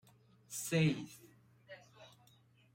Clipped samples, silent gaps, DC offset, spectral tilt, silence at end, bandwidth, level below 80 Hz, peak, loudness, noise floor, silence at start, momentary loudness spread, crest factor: under 0.1%; none; under 0.1%; -5 dB/octave; 0.65 s; 16 kHz; -76 dBFS; -20 dBFS; -36 LUFS; -68 dBFS; 0.5 s; 27 LU; 20 dB